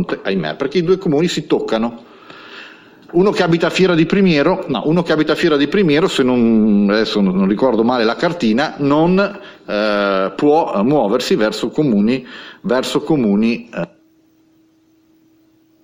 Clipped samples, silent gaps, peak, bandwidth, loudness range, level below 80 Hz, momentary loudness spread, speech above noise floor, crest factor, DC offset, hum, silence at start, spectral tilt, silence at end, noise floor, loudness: under 0.1%; none; -2 dBFS; 15.5 kHz; 5 LU; -48 dBFS; 9 LU; 40 dB; 14 dB; under 0.1%; none; 0 s; -6.5 dB/octave; 1.95 s; -54 dBFS; -15 LUFS